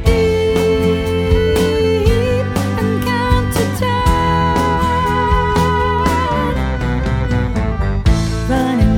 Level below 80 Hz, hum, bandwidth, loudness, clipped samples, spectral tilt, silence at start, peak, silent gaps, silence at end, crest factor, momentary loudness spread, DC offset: -22 dBFS; none; 18 kHz; -15 LUFS; under 0.1%; -6.5 dB/octave; 0 s; 0 dBFS; none; 0 s; 14 dB; 4 LU; under 0.1%